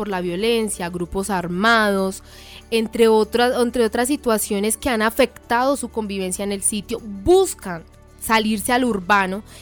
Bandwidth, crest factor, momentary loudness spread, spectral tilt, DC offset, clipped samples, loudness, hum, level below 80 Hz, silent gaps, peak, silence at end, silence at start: over 20 kHz; 14 dB; 10 LU; -3.5 dB/octave; under 0.1%; under 0.1%; -20 LUFS; none; -44 dBFS; none; -6 dBFS; 0 s; 0 s